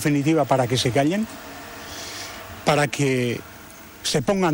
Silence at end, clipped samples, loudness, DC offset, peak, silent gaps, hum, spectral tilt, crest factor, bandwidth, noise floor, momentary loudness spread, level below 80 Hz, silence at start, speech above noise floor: 0 s; under 0.1%; -22 LUFS; under 0.1%; -6 dBFS; none; none; -5 dB/octave; 16 dB; 16 kHz; -42 dBFS; 17 LU; -52 dBFS; 0 s; 22 dB